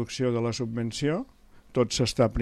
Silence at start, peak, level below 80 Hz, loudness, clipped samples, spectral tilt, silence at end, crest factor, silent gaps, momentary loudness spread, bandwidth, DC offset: 0 s; -10 dBFS; -52 dBFS; -28 LUFS; under 0.1%; -5.5 dB/octave; 0 s; 18 dB; none; 8 LU; 12.5 kHz; under 0.1%